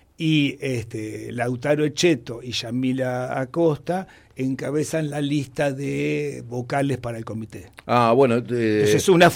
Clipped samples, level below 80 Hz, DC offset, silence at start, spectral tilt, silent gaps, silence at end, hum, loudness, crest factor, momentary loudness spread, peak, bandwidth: under 0.1%; -56 dBFS; under 0.1%; 0.2 s; -5.5 dB/octave; none; 0 s; none; -23 LUFS; 18 dB; 13 LU; -4 dBFS; 16.5 kHz